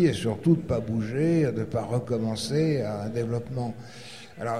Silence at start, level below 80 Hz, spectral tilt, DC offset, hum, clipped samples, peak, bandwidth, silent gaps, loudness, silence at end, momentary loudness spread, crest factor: 0 s; -52 dBFS; -7 dB/octave; 0.3%; none; under 0.1%; -10 dBFS; 13.5 kHz; none; -27 LUFS; 0 s; 12 LU; 16 dB